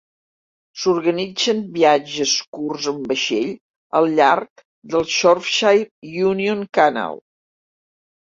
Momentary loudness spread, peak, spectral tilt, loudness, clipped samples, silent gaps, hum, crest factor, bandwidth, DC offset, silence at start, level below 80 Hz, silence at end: 12 LU; -2 dBFS; -3.5 dB/octave; -18 LUFS; under 0.1%; 2.48-2.53 s, 3.61-3.90 s, 4.50-4.56 s, 4.65-4.82 s, 5.91-6.02 s; none; 18 dB; 7.8 kHz; under 0.1%; 0.75 s; -62 dBFS; 1.2 s